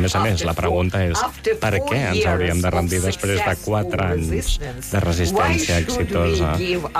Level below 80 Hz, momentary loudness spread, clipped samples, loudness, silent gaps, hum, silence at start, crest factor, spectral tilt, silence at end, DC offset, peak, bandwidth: -30 dBFS; 4 LU; under 0.1%; -20 LUFS; none; none; 0 s; 10 dB; -5 dB/octave; 0 s; under 0.1%; -10 dBFS; 15 kHz